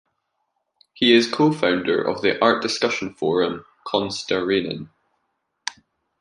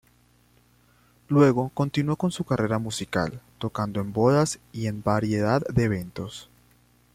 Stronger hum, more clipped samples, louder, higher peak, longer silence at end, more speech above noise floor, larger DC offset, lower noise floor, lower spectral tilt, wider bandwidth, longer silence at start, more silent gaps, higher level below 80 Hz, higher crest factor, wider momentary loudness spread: second, none vs 60 Hz at -50 dBFS; neither; first, -20 LUFS vs -25 LUFS; first, -2 dBFS vs -6 dBFS; second, 0.5 s vs 0.7 s; first, 54 dB vs 36 dB; neither; first, -74 dBFS vs -61 dBFS; second, -4.5 dB/octave vs -6.5 dB/octave; second, 11 kHz vs 15.5 kHz; second, 0.95 s vs 1.3 s; neither; second, -60 dBFS vs -54 dBFS; about the same, 20 dB vs 18 dB; first, 16 LU vs 12 LU